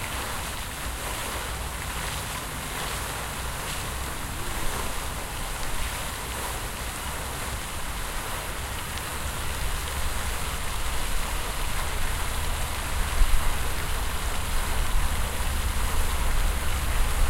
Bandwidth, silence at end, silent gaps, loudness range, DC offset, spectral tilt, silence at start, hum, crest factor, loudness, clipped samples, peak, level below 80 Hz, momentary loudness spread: 16 kHz; 0 s; none; 3 LU; under 0.1%; -3 dB/octave; 0 s; none; 20 dB; -30 LUFS; under 0.1%; -6 dBFS; -30 dBFS; 4 LU